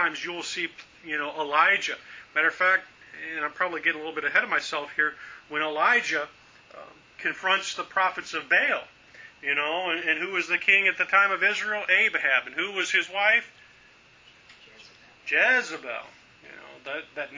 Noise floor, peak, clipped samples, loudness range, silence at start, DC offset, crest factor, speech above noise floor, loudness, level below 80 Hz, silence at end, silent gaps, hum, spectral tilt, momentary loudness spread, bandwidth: -55 dBFS; -6 dBFS; under 0.1%; 5 LU; 0 s; under 0.1%; 22 dB; 29 dB; -24 LUFS; -72 dBFS; 0 s; none; none; -1.5 dB/octave; 14 LU; 7.6 kHz